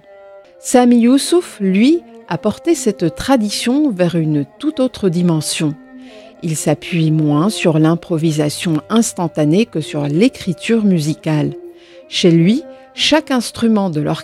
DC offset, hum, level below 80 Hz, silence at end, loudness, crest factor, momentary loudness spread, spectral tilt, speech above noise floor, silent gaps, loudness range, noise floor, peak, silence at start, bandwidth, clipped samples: under 0.1%; none; -50 dBFS; 0 s; -15 LUFS; 14 dB; 8 LU; -5.5 dB/octave; 26 dB; none; 2 LU; -40 dBFS; 0 dBFS; 0.25 s; 15 kHz; under 0.1%